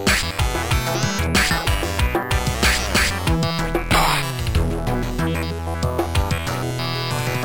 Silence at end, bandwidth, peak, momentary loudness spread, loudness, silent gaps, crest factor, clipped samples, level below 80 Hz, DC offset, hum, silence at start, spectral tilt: 0 s; 17 kHz; -6 dBFS; 6 LU; -20 LUFS; none; 14 dB; under 0.1%; -28 dBFS; 0.8%; none; 0 s; -4 dB/octave